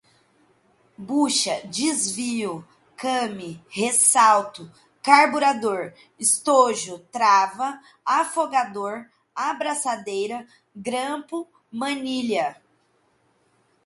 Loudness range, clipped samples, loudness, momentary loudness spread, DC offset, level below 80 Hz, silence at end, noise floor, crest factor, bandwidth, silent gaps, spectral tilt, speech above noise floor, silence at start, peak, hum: 9 LU; under 0.1%; -22 LUFS; 17 LU; under 0.1%; -72 dBFS; 1.3 s; -65 dBFS; 22 dB; 12 kHz; none; -2 dB/octave; 43 dB; 1 s; 0 dBFS; none